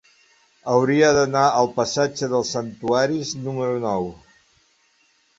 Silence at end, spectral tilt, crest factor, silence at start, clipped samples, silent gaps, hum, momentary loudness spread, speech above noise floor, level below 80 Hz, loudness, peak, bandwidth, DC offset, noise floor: 1.25 s; -4.5 dB/octave; 18 dB; 0.65 s; under 0.1%; none; none; 11 LU; 42 dB; -56 dBFS; -21 LUFS; -4 dBFS; 8 kHz; under 0.1%; -62 dBFS